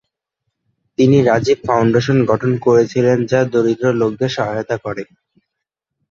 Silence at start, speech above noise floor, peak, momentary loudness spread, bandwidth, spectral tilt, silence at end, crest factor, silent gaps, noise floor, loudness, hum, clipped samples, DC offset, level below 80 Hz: 1 s; 65 dB; 0 dBFS; 10 LU; 7.6 kHz; -7 dB/octave; 1.1 s; 16 dB; none; -79 dBFS; -15 LUFS; none; under 0.1%; under 0.1%; -50 dBFS